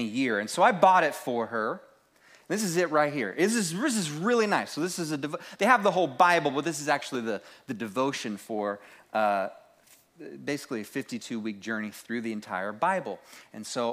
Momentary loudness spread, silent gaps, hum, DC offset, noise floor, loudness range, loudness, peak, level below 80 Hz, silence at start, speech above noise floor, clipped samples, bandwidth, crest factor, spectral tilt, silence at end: 14 LU; none; none; under 0.1%; -60 dBFS; 7 LU; -28 LUFS; -6 dBFS; -80 dBFS; 0 s; 32 dB; under 0.1%; 15.5 kHz; 22 dB; -4 dB/octave; 0 s